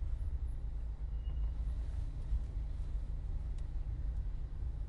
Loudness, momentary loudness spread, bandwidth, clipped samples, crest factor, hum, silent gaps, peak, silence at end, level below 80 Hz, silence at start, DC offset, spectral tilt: -43 LUFS; 3 LU; 4.4 kHz; under 0.1%; 12 dB; none; none; -26 dBFS; 0 s; -38 dBFS; 0 s; under 0.1%; -8.5 dB/octave